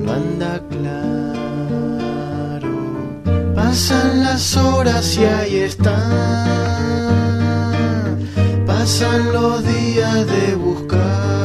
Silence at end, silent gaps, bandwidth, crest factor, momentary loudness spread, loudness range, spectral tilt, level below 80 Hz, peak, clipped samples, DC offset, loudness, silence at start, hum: 0 s; none; 14 kHz; 14 dB; 8 LU; 5 LU; -5.5 dB/octave; -36 dBFS; -2 dBFS; under 0.1%; under 0.1%; -17 LUFS; 0 s; none